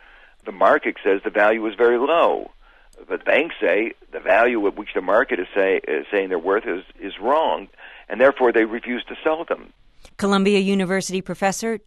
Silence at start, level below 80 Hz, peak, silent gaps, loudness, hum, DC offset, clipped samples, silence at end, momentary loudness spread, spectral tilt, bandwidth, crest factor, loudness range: 0.45 s; -54 dBFS; -4 dBFS; none; -20 LUFS; none; under 0.1%; under 0.1%; 0.1 s; 11 LU; -5 dB/octave; 12.5 kHz; 18 dB; 2 LU